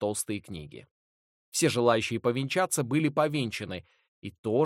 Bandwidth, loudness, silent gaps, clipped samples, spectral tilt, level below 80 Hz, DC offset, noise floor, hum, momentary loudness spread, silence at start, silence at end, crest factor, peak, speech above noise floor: 16.5 kHz; -28 LUFS; 0.91-1.52 s, 4.08-4.22 s, 4.38-4.44 s; under 0.1%; -4.5 dB/octave; -64 dBFS; under 0.1%; under -90 dBFS; none; 17 LU; 0 s; 0 s; 20 dB; -10 dBFS; over 62 dB